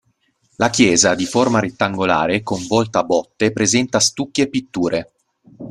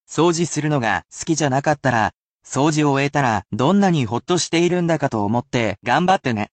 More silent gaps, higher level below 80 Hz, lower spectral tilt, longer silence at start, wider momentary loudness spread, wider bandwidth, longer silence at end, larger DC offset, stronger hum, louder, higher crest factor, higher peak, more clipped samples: second, none vs 2.16-2.39 s; about the same, -52 dBFS vs -54 dBFS; second, -3.5 dB/octave vs -5 dB/octave; first, 0.6 s vs 0.1 s; about the same, 7 LU vs 5 LU; first, 13 kHz vs 9 kHz; about the same, 0 s vs 0.05 s; neither; neither; about the same, -17 LUFS vs -19 LUFS; about the same, 18 dB vs 14 dB; first, 0 dBFS vs -4 dBFS; neither